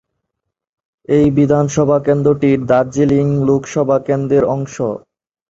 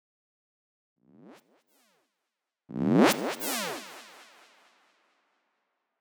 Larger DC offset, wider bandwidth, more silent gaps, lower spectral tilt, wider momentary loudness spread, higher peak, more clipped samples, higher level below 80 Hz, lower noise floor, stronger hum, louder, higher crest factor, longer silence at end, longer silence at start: neither; second, 7.8 kHz vs over 20 kHz; neither; first, -7.5 dB/octave vs -4.5 dB/octave; second, 7 LU vs 23 LU; first, 0 dBFS vs -10 dBFS; neither; first, -46 dBFS vs -80 dBFS; second, -77 dBFS vs -86 dBFS; neither; first, -14 LUFS vs -27 LUFS; second, 14 dB vs 24 dB; second, 0.5 s vs 1.95 s; second, 1.1 s vs 1.25 s